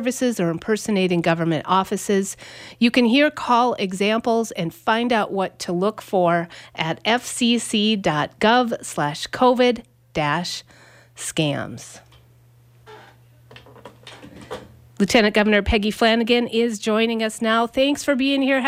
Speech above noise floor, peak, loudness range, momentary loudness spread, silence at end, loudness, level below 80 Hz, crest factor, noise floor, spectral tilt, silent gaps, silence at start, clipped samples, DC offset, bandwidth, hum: 32 dB; -4 dBFS; 9 LU; 12 LU; 0 s; -20 LUFS; -44 dBFS; 18 dB; -52 dBFS; -4.5 dB/octave; none; 0 s; under 0.1%; under 0.1%; 16 kHz; none